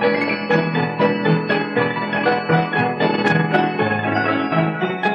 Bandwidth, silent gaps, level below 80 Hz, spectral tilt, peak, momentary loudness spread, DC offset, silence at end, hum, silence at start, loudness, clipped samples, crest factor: 7 kHz; none; -62 dBFS; -8 dB/octave; -4 dBFS; 3 LU; under 0.1%; 0 s; none; 0 s; -18 LUFS; under 0.1%; 14 dB